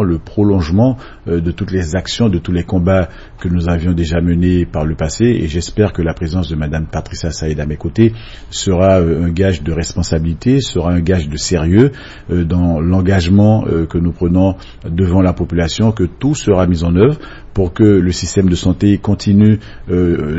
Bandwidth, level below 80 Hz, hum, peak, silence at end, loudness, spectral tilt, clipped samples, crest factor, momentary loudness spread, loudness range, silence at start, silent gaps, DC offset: 8 kHz; -28 dBFS; none; 0 dBFS; 0 s; -14 LUFS; -7 dB/octave; under 0.1%; 14 dB; 9 LU; 3 LU; 0 s; none; under 0.1%